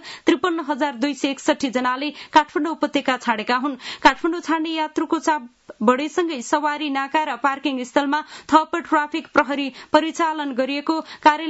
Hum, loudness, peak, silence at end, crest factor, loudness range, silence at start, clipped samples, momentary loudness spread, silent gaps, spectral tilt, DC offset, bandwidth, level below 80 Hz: none; -21 LUFS; -2 dBFS; 0 s; 20 dB; 1 LU; 0 s; under 0.1%; 6 LU; none; -3 dB/octave; under 0.1%; 8 kHz; -58 dBFS